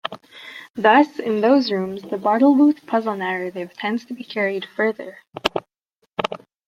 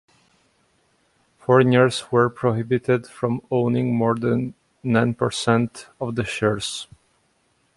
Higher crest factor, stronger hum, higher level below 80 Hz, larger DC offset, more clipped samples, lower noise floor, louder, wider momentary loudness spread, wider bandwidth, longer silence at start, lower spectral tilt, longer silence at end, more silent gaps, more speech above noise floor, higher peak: about the same, 20 dB vs 20 dB; neither; second, -62 dBFS vs -56 dBFS; neither; neither; first, -70 dBFS vs -65 dBFS; about the same, -20 LUFS vs -21 LUFS; first, 17 LU vs 12 LU; about the same, 12 kHz vs 11.5 kHz; second, 0.05 s vs 1.5 s; about the same, -6 dB/octave vs -6 dB/octave; second, 0.3 s vs 0.9 s; first, 0.70-0.74 s vs none; first, 50 dB vs 45 dB; about the same, 0 dBFS vs -2 dBFS